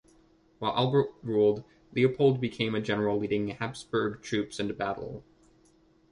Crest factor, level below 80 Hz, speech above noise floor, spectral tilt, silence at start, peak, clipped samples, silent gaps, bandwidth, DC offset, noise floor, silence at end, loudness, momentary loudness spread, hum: 18 dB; -62 dBFS; 35 dB; -6.5 dB/octave; 0.6 s; -12 dBFS; under 0.1%; none; 11 kHz; under 0.1%; -63 dBFS; 0.9 s; -29 LUFS; 10 LU; none